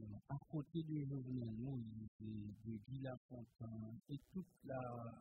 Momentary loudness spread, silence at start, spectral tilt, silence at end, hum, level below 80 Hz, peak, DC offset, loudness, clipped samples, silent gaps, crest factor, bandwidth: 8 LU; 0 s; -10 dB/octave; 0 s; none; -72 dBFS; -34 dBFS; under 0.1%; -50 LUFS; under 0.1%; 2.08-2.19 s, 3.17-3.29 s; 16 dB; 4.4 kHz